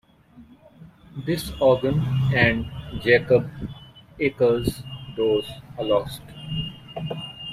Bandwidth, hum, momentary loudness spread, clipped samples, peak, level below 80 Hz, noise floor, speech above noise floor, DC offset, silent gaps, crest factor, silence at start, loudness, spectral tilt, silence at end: 15.5 kHz; none; 17 LU; under 0.1%; -2 dBFS; -46 dBFS; -50 dBFS; 29 dB; under 0.1%; none; 22 dB; 0.35 s; -23 LUFS; -6.5 dB/octave; 0 s